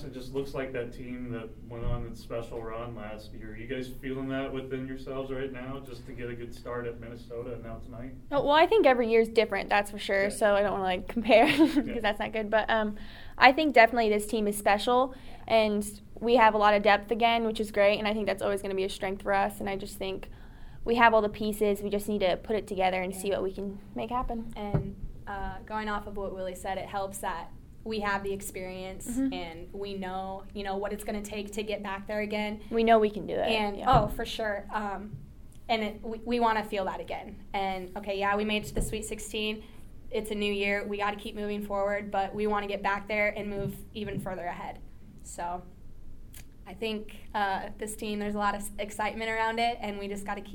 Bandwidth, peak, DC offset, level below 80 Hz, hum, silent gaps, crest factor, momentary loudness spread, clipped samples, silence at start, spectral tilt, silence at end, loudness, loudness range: 19 kHz; -4 dBFS; under 0.1%; -46 dBFS; none; none; 26 dB; 17 LU; under 0.1%; 0 s; -4.5 dB/octave; 0 s; -29 LUFS; 12 LU